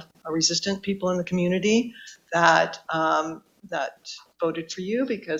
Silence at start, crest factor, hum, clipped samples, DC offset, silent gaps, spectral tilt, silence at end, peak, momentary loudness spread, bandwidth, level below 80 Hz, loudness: 0 s; 22 dB; none; under 0.1%; under 0.1%; none; -4 dB/octave; 0 s; -4 dBFS; 14 LU; 8.4 kHz; -64 dBFS; -24 LUFS